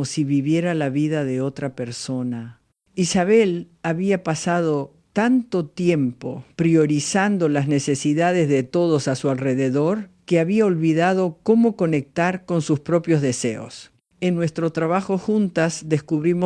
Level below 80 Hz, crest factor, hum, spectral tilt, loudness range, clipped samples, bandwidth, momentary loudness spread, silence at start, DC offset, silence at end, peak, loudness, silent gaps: -60 dBFS; 16 dB; none; -6 dB/octave; 3 LU; under 0.1%; 10.5 kHz; 9 LU; 0 s; under 0.1%; 0 s; -4 dBFS; -21 LUFS; none